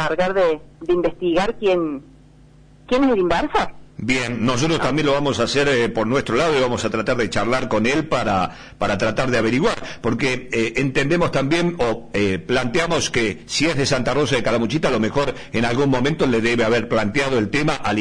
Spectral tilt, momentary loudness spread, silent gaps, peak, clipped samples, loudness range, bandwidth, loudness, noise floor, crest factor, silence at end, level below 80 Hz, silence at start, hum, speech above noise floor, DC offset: -5 dB/octave; 4 LU; none; -8 dBFS; under 0.1%; 2 LU; 10.5 kHz; -20 LUFS; -48 dBFS; 12 dB; 0 s; -40 dBFS; 0 s; none; 28 dB; 0.1%